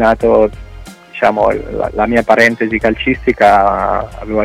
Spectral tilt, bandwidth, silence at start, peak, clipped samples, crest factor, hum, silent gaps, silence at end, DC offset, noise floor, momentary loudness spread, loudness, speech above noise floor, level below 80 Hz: -6 dB/octave; 15 kHz; 0 s; 0 dBFS; under 0.1%; 12 dB; none; none; 0 s; under 0.1%; -33 dBFS; 10 LU; -12 LUFS; 21 dB; -32 dBFS